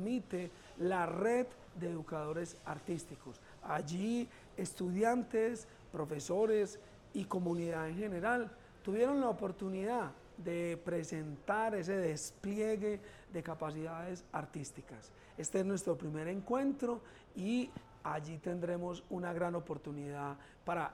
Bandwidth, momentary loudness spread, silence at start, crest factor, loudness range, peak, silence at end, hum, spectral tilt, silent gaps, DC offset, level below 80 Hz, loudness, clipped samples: 16 kHz; 12 LU; 0 s; 18 dB; 5 LU; -20 dBFS; 0 s; none; -6 dB/octave; none; under 0.1%; -66 dBFS; -39 LUFS; under 0.1%